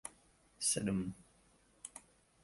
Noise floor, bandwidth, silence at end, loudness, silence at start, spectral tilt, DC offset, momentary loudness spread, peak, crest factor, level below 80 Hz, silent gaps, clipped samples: -70 dBFS; 12 kHz; 0.45 s; -37 LUFS; 0.05 s; -3.5 dB/octave; under 0.1%; 21 LU; -22 dBFS; 22 dB; -66 dBFS; none; under 0.1%